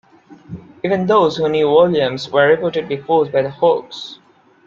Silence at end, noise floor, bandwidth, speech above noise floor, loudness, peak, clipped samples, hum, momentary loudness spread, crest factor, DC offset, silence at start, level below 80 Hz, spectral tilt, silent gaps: 0.5 s; -41 dBFS; 7.4 kHz; 25 dB; -16 LUFS; 0 dBFS; under 0.1%; none; 18 LU; 16 dB; under 0.1%; 0.3 s; -58 dBFS; -6.5 dB/octave; none